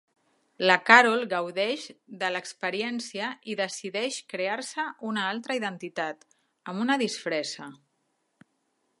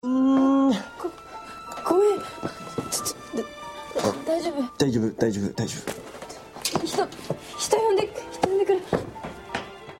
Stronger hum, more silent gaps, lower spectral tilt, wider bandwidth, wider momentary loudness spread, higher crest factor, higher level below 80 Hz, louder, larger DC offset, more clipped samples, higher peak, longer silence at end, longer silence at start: neither; neither; second, -3 dB/octave vs -4.5 dB/octave; second, 11.5 kHz vs 16 kHz; about the same, 15 LU vs 16 LU; first, 28 dB vs 20 dB; second, -84 dBFS vs -56 dBFS; about the same, -26 LUFS vs -25 LUFS; neither; neither; first, -2 dBFS vs -6 dBFS; first, 1.25 s vs 0 s; first, 0.6 s vs 0.05 s